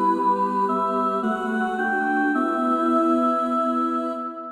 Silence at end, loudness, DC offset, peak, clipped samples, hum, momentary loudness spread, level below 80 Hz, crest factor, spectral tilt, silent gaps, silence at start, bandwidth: 0 s; -22 LUFS; under 0.1%; -10 dBFS; under 0.1%; none; 4 LU; -64 dBFS; 12 dB; -6.5 dB/octave; none; 0 s; 11.5 kHz